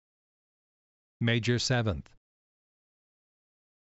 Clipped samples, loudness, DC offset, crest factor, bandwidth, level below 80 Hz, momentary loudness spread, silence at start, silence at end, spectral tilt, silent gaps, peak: under 0.1%; -29 LUFS; under 0.1%; 22 dB; 8 kHz; -56 dBFS; 7 LU; 1.2 s; 1.85 s; -4.5 dB/octave; none; -14 dBFS